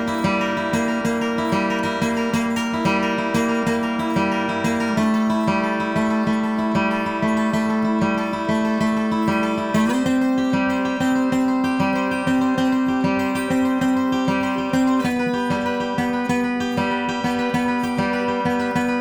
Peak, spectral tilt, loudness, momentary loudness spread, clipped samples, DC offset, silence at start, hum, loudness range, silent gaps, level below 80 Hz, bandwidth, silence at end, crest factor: -6 dBFS; -5.5 dB/octave; -21 LUFS; 2 LU; under 0.1%; under 0.1%; 0 s; none; 1 LU; none; -52 dBFS; 20 kHz; 0 s; 14 dB